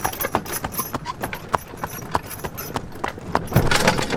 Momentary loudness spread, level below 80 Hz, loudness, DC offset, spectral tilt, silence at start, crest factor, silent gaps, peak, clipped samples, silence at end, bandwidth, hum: 12 LU; -36 dBFS; -24 LUFS; under 0.1%; -4 dB/octave; 0 s; 24 dB; none; 0 dBFS; under 0.1%; 0 s; 18 kHz; none